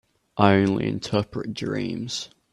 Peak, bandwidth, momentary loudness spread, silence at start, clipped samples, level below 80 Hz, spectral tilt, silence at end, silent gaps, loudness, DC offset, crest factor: -2 dBFS; 11.5 kHz; 12 LU; 0.35 s; under 0.1%; -56 dBFS; -6 dB/octave; 0.25 s; none; -24 LUFS; under 0.1%; 22 dB